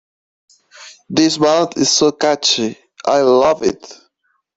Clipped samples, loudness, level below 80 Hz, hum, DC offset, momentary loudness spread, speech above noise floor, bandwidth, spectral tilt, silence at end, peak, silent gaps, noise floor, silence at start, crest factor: under 0.1%; -14 LUFS; -56 dBFS; none; under 0.1%; 9 LU; 51 dB; 8.2 kHz; -3 dB/octave; 0.6 s; -2 dBFS; none; -66 dBFS; 0.8 s; 16 dB